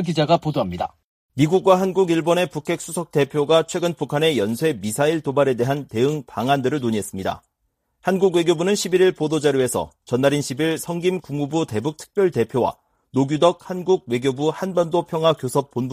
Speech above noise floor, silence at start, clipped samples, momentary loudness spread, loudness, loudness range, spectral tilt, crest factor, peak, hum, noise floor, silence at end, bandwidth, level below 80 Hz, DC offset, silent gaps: 52 dB; 0 s; under 0.1%; 8 LU; -21 LUFS; 2 LU; -5.5 dB/octave; 20 dB; -2 dBFS; none; -72 dBFS; 0 s; 15.5 kHz; -58 dBFS; under 0.1%; 1.04-1.29 s